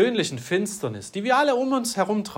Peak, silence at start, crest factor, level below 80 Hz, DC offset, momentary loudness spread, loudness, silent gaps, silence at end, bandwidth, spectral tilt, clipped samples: -6 dBFS; 0 s; 16 dB; -68 dBFS; under 0.1%; 10 LU; -24 LUFS; none; 0 s; 16.5 kHz; -4 dB/octave; under 0.1%